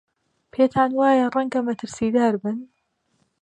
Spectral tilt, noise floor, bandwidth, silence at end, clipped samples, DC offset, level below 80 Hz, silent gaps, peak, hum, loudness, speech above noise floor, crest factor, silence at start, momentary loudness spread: -6 dB/octave; -70 dBFS; 9.4 kHz; 0.75 s; under 0.1%; under 0.1%; -60 dBFS; none; -6 dBFS; none; -21 LUFS; 50 dB; 16 dB; 0.55 s; 11 LU